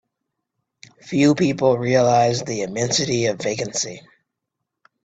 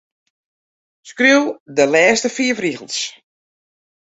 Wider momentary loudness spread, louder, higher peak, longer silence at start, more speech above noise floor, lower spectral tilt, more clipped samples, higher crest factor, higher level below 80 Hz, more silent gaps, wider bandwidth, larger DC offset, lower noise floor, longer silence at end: about the same, 9 LU vs 11 LU; second, -19 LUFS vs -16 LUFS; about the same, -4 dBFS vs -2 dBFS; about the same, 1.05 s vs 1.05 s; second, 62 dB vs over 74 dB; first, -4.5 dB/octave vs -2.5 dB/octave; neither; about the same, 18 dB vs 18 dB; about the same, -58 dBFS vs -62 dBFS; second, none vs 1.60-1.66 s; about the same, 9 kHz vs 8.2 kHz; neither; second, -81 dBFS vs under -90 dBFS; about the same, 1.05 s vs 0.95 s